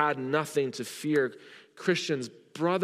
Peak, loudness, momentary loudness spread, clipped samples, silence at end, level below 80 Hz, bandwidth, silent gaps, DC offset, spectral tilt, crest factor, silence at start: -10 dBFS; -30 LUFS; 7 LU; under 0.1%; 0 s; -84 dBFS; 15.5 kHz; none; under 0.1%; -5 dB/octave; 18 dB; 0 s